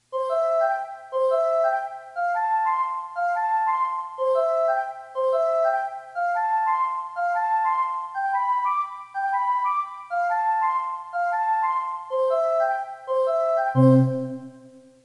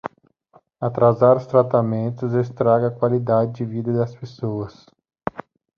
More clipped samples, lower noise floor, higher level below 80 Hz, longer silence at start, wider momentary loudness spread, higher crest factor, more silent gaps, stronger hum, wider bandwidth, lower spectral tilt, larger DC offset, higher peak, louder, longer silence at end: neither; second, -49 dBFS vs -57 dBFS; second, -78 dBFS vs -58 dBFS; about the same, 0.1 s vs 0.05 s; second, 7 LU vs 16 LU; about the same, 16 dB vs 18 dB; neither; neither; first, 11 kHz vs 6.6 kHz; second, -8.5 dB/octave vs -10 dB/octave; neither; second, -8 dBFS vs -2 dBFS; second, -24 LUFS vs -20 LUFS; about the same, 0.25 s vs 0.35 s